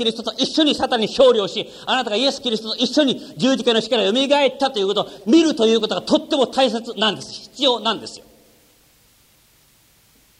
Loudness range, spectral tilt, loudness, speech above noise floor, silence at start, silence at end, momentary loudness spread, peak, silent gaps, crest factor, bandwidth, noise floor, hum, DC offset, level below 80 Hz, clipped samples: 5 LU; -3.5 dB/octave; -18 LUFS; 37 dB; 0 s; 2.2 s; 8 LU; -2 dBFS; none; 16 dB; 15 kHz; -55 dBFS; none; under 0.1%; -58 dBFS; under 0.1%